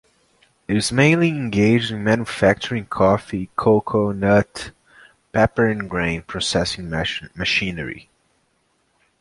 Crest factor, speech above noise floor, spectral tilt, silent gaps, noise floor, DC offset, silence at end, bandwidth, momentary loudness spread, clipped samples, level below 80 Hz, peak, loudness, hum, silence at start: 18 dB; 46 dB; -5.5 dB/octave; none; -66 dBFS; under 0.1%; 1.2 s; 11.5 kHz; 10 LU; under 0.1%; -44 dBFS; -2 dBFS; -20 LUFS; none; 0.7 s